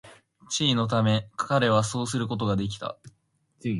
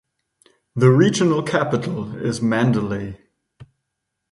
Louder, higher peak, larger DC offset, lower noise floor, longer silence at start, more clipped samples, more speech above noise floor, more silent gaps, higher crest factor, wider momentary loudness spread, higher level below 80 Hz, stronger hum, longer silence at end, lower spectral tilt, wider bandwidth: second, -26 LUFS vs -19 LUFS; second, -8 dBFS vs -2 dBFS; neither; second, -63 dBFS vs -78 dBFS; second, 0.05 s vs 0.75 s; neither; second, 38 dB vs 60 dB; neither; about the same, 18 dB vs 20 dB; about the same, 13 LU vs 13 LU; about the same, -56 dBFS vs -54 dBFS; neither; second, 0 s vs 0.65 s; second, -5 dB/octave vs -6.5 dB/octave; about the same, 11.5 kHz vs 11.5 kHz